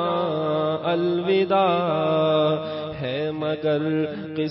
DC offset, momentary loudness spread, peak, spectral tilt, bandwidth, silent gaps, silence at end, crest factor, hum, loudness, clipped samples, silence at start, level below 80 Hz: under 0.1%; 8 LU; -10 dBFS; -11 dB/octave; 5.8 kHz; none; 0 s; 14 dB; none; -23 LUFS; under 0.1%; 0 s; -60 dBFS